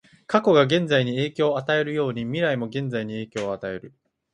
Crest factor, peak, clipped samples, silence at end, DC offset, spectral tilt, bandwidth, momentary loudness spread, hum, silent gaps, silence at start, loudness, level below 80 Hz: 20 dB; -4 dBFS; under 0.1%; 0.45 s; under 0.1%; -6.5 dB/octave; 10 kHz; 11 LU; none; none; 0.3 s; -23 LUFS; -62 dBFS